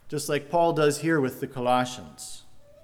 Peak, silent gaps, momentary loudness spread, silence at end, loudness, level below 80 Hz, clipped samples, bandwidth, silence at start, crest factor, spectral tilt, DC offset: -10 dBFS; none; 18 LU; 0.2 s; -25 LUFS; -62 dBFS; under 0.1%; 18.5 kHz; 0.05 s; 16 dB; -5 dB/octave; under 0.1%